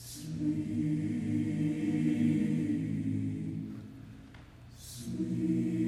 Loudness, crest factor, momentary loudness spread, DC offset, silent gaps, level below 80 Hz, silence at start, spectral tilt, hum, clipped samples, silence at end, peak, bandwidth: -33 LUFS; 14 dB; 20 LU; under 0.1%; none; -60 dBFS; 0 s; -7.5 dB/octave; none; under 0.1%; 0 s; -18 dBFS; 14.5 kHz